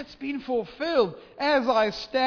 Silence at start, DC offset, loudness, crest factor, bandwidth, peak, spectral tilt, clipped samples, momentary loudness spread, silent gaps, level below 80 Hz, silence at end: 0 s; under 0.1%; -26 LUFS; 16 dB; 5.4 kHz; -10 dBFS; -5 dB/octave; under 0.1%; 9 LU; none; -58 dBFS; 0 s